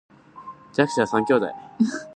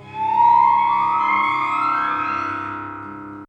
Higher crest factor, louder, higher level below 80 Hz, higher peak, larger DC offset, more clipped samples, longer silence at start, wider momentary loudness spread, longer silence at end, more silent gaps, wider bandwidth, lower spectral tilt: first, 22 dB vs 14 dB; second, -23 LUFS vs -18 LUFS; second, -66 dBFS vs -60 dBFS; first, -2 dBFS vs -6 dBFS; neither; neither; first, 0.35 s vs 0 s; first, 21 LU vs 16 LU; about the same, 0 s vs 0.05 s; neither; first, 9.6 kHz vs 8.2 kHz; about the same, -5.5 dB/octave vs -5 dB/octave